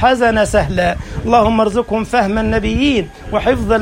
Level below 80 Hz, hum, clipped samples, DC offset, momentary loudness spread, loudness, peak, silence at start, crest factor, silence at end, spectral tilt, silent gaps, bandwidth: -28 dBFS; none; under 0.1%; under 0.1%; 6 LU; -15 LUFS; 0 dBFS; 0 s; 14 dB; 0 s; -5.5 dB/octave; none; 16 kHz